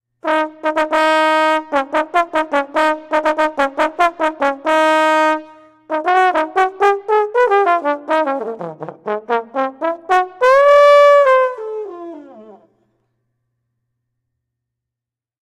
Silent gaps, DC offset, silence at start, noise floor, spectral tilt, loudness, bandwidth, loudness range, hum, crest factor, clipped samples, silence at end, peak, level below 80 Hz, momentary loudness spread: none; under 0.1%; 0.25 s; -86 dBFS; -3.5 dB/octave; -15 LUFS; 13 kHz; 5 LU; none; 14 dB; under 0.1%; 3.05 s; -2 dBFS; -58 dBFS; 15 LU